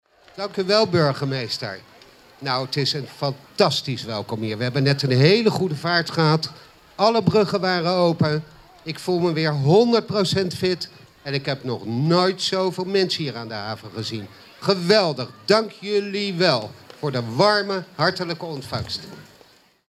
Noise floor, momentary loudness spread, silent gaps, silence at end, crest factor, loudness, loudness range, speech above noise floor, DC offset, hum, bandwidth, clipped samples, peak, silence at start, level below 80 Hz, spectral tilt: -54 dBFS; 13 LU; none; 0.7 s; 18 dB; -21 LUFS; 4 LU; 33 dB; under 0.1%; none; 14.5 kHz; under 0.1%; -2 dBFS; 0.35 s; -60 dBFS; -5.5 dB/octave